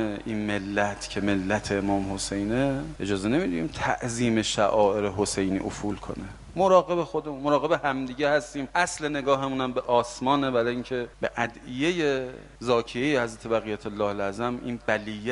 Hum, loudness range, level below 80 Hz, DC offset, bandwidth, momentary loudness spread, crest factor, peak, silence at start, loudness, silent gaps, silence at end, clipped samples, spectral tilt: none; 3 LU; -48 dBFS; under 0.1%; 11.5 kHz; 8 LU; 20 dB; -6 dBFS; 0 s; -26 LUFS; none; 0 s; under 0.1%; -5 dB/octave